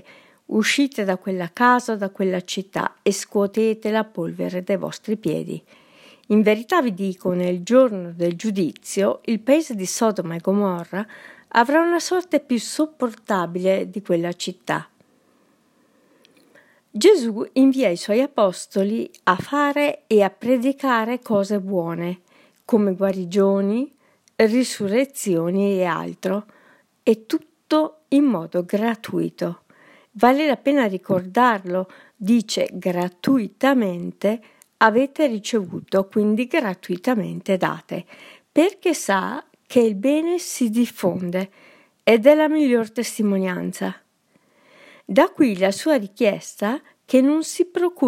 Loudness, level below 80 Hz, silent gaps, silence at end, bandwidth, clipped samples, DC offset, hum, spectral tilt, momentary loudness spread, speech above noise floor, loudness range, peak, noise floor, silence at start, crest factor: -21 LUFS; -72 dBFS; none; 0 s; 16.5 kHz; under 0.1%; under 0.1%; none; -5 dB/octave; 10 LU; 42 dB; 3 LU; 0 dBFS; -62 dBFS; 0.5 s; 20 dB